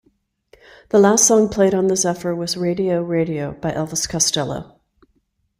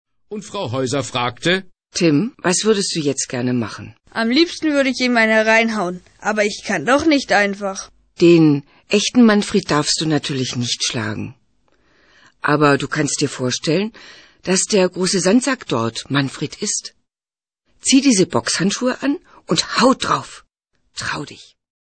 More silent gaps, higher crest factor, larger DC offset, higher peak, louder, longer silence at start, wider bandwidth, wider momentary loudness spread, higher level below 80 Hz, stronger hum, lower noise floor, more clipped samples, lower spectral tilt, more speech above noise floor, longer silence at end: neither; about the same, 18 dB vs 16 dB; neither; about the same, -2 dBFS vs -2 dBFS; about the same, -18 LUFS vs -17 LUFS; first, 0.95 s vs 0.3 s; first, 16 kHz vs 9.2 kHz; about the same, 12 LU vs 14 LU; about the same, -50 dBFS vs -54 dBFS; neither; second, -66 dBFS vs under -90 dBFS; neither; about the same, -4 dB/octave vs -4 dB/octave; second, 48 dB vs over 72 dB; first, 0.95 s vs 0.55 s